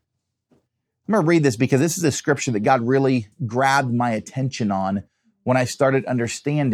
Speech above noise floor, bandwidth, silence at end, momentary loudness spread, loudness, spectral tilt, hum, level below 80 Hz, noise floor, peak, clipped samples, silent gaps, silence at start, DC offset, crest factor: 58 dB; 14.5 kHz; 0 s; 8 LU; -20 LUFS; -5.5 dB/octave; none; -68 dBFS; -78 dBFS; -2 dBFS; under 0.1%; none; 1.1 s; under 0.1%; 18 dB